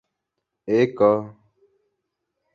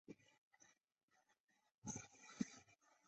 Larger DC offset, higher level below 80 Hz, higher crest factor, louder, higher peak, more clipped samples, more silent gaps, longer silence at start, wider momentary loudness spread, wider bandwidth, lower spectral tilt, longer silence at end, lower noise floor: neither; first, -64 dBFS vs -82 dBFS; second, 20 dB vs 28 dB; first, -20 LUFS vs -53 LUFS; first, -4 dBFS vs -30 dBFS; neither; second, none vs 0.38-0.51 s, 1.03-1.08 s, 1.40-1.44 s, 1.74-1.82 s; first, 0.65 s vs 0.1 s; first, 22 LU vs 15 LU; second, 6.8 kHz vs 8.2 kHz; first, -8 dB/octave vs -4 dB/octave; first, 1.25 s vs 0.15 s; second, -81 dBFS vs -86 dBFS